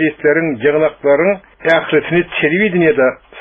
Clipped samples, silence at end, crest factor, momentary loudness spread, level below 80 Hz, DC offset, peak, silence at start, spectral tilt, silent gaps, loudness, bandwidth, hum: under 0.1%; 0 s; 14 dB; 4 LU; -50 dBFS; under 0.1%; 0 dBFS; 0 s; -4.5 dB/octave; none; -14 LUFS; 5.6 kHz; none